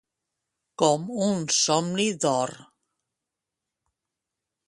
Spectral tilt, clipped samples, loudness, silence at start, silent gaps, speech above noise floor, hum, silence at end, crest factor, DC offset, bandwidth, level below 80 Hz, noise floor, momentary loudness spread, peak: -3.5 dB/octave; under 0.1%; -24 LUFS; 0.8 s; none; 62 dB; none; 2.05 s; 22 dB; under 0.1%; 11.5 kHz; -70 dBFS; -86 dBFS; 5 LU; -6 dBFS